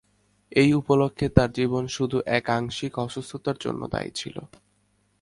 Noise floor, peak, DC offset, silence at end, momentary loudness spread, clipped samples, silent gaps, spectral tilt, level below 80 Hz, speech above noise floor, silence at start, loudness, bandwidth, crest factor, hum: -67 dBFS; 0 dBFS; under 0.1%; 0.75 s; 12 LU; under 0.1%; none; -6 dB/octave; -44 dBFS; 43 dB; 0.5 s; -25 LUFS; 11.5 kHz; 24 dB; none